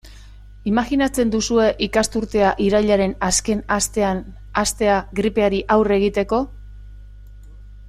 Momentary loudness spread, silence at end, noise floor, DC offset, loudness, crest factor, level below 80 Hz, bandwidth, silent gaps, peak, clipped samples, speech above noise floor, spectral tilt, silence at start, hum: 5 LU; 0 s; -41 dBFS; under 0.1%; -19 LUFS; 16 dB; -38 dBFS; 14.5 kHz; none; -4 dBFS; under 0.1%; 22 dB; -4 dB/octave; 0.05 s; 50 Hz at -35 dBFS